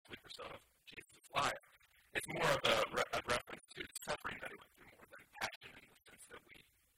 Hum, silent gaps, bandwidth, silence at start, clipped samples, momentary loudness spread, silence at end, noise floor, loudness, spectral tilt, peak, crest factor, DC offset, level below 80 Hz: none; 5.56-5.61 s; 16 kHz; 0.1 s; under 0.1%; 23 LU; 0.35 s; -69 dBFS; -40 LUFS; -2.5 dB/octave; -18 dBFS; 26 dB; under 0.1%; -68 dBFS